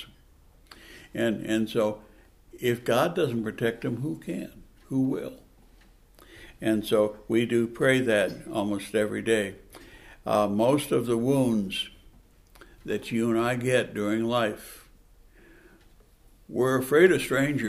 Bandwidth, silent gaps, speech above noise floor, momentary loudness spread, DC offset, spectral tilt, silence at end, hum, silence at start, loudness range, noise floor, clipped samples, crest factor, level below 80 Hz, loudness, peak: 15.5 kHz; none; 31 dB; 14 LU; under 0.1%; -5.5 dB/octave; 0 s; none; 0 s; 4 LU; -56 dBFS; under 0.1%; 22 dB; -56 dBFS; -26 LUFS; -4 dBFS